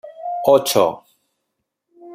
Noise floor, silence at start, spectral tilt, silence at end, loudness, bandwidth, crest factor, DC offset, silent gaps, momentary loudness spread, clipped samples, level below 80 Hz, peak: -76 dBFS; 0.05 s; -3.5 dB/octave; 0 s; -17 LUFS; 16 kHz; 18 dB; under 0.1%; none; 15 LU; under 0.1%; -66 dBFS; -2 dBFS